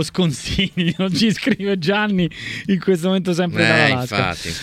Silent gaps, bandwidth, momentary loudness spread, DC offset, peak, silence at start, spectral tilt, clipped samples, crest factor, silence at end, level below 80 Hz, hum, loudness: none; 15 kHz; 6 LU; under 0.1%; 0 dBFS; 0 s; -5 dB/octave; under 0.1%; 18 dB; 0 s; -42 dBFS; none; -18 LUFS